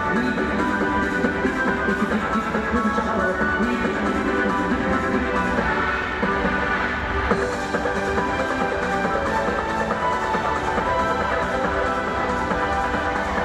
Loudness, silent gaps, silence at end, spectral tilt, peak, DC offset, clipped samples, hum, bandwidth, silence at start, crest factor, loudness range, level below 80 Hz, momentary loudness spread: -22 LUFS; none; 0 s; -5.5 dB/octave; -4 dBFS; under 0.1%; under 0.1%; none; 13.5 kHz; 0 s; 18 dB; 1 LU; -36 dBFS; 2 LU